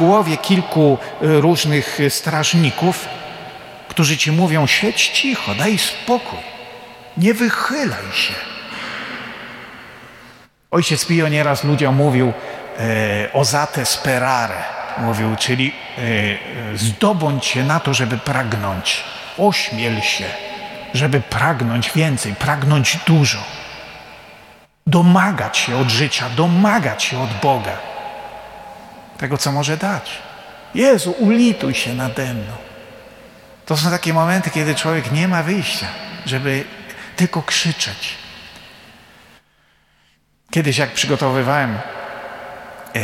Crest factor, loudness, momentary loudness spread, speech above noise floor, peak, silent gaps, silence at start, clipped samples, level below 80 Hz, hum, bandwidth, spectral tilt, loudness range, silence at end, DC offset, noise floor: 16 dB; -17 LUFS; 17 LU; 42 dB; -2 dBFS; none; 0 s; under 0.1%; -52 dBFS; none; 16.5 kHz; -4.5 dB/octave; 5 LU; 0 s; under 0.1%; -59 dBFS